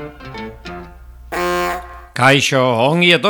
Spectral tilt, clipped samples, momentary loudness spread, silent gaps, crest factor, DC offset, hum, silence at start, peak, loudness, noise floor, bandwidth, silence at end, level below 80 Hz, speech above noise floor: -4.5 dB/octave; under 0.1%; 20 LU; none; 16 dB; under 0.1%; none; 0 s; 0 dBFS; -15 LUFS; -37 dBFS; over 20 kHz; 0 s; -40 dBFS; 24 dB